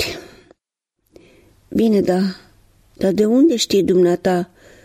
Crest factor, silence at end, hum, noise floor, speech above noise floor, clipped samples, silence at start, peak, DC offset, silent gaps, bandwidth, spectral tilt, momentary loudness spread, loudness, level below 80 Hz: 14 dB; 0.4 s; none; -77 dBFS; 61 dB; under 0.1%; 0 s; -4 dBFS; under 0.1%; none; 15.5 kHz; -5.5 dB/octave; 11 LU; -17 LUFS; -52 dBFS